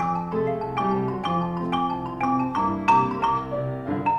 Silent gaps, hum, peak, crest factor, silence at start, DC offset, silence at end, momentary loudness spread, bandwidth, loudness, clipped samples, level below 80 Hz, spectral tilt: none; none; -8 dBFS; 16 dB; 0 s; under 0.1%; 0 s; 7 LU; 9.6 kHz; -24 LUFS; under 0.1%; -50 dBFS; -7.5 dB/octave